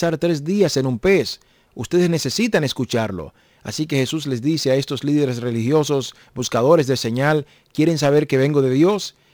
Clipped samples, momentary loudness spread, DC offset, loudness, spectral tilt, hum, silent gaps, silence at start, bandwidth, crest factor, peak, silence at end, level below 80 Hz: under 0.1%; 11 LU; under 0.1%; -19 LUFS; -5.5 dB/octave; none; none; 0 s; over 20 kHz; 16 dB; -2 dBFS; 0.25 s; -52 dBFS